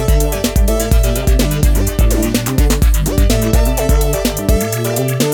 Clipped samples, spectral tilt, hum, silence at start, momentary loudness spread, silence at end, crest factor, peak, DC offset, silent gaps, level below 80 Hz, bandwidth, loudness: under 0.1%; -5 dB/octave; none; 0 s; 2 LU; 0 s; 12 dB; 0 dBFS; under 0.1%; none; -14 dBFS; 20 kHz; -15 LUFS